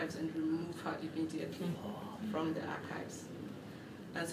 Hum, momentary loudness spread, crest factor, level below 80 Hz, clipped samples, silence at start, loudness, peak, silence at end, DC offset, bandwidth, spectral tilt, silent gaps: none; 10 LU; 16 dB; -74 dBFS; under 0.1%; 0 s; -41 LUFS; -24 dBFS; 0 s; under 0.1%; 15.5 kHz; -5.5 dB/octave; none